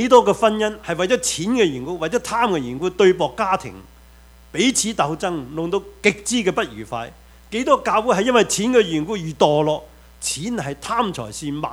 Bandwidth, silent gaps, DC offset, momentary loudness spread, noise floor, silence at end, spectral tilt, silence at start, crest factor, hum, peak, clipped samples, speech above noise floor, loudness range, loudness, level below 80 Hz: 16.5 kHz; none; under 0.1%; 11 LU; -46 dBFS; 0 s; -4 dB/octave; 0 s; 20 dB; none; 0 dBFS; under 0.1%; 27 dB; 3 LU; -20 LUFS; -48 dBFS